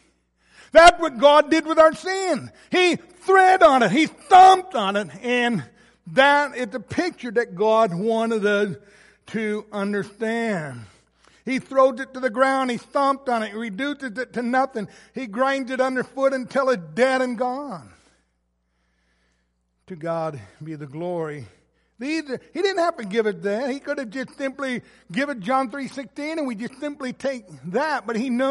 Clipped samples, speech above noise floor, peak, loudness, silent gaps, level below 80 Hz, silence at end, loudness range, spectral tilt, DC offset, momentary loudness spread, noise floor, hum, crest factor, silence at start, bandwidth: under 0.1%; 50 dB; -2 dBFS; -21 LUFS; none; -52 dBFS; 0 s; 13 LU; -4.5 dB/octave; under 0.1%; 16 LU; -71 dBFS; none; 20 dB; 0.75 s; 11.5 kHz